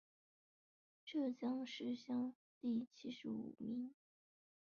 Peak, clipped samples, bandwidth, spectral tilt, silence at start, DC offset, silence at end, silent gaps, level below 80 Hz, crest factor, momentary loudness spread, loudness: -32 dBFS; under 0.1%; 6.8 kHz; -4.5 dB/octave; 1.05 s; under 0.1%; 0.75 s; 2.35-2.61 s; -88 dBFS; 14 dB; 7 LU; -46 LUFS